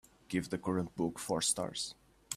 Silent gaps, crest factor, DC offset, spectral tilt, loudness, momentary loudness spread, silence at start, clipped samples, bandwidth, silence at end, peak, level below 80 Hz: none; 20 dB; under 0.1%; -3.5 dB/octave; -36 LUFS; 7 LU; 0.3 s; under 0.1%; 15.5 kHz; 0 s; -18 dBFS; -66 dBFS